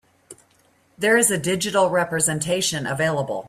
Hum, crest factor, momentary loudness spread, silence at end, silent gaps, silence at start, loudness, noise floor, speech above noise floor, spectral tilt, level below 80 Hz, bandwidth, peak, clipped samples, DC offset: none; 18 dB; 6 LU; 0 s; none; 0.3 s; -20 LUFS; -60 dBFS; 39 dB; -3 dB/octave; -60 dBFS; 15.5 kHz; -4 dBFS; under 0.1%; under 0.1%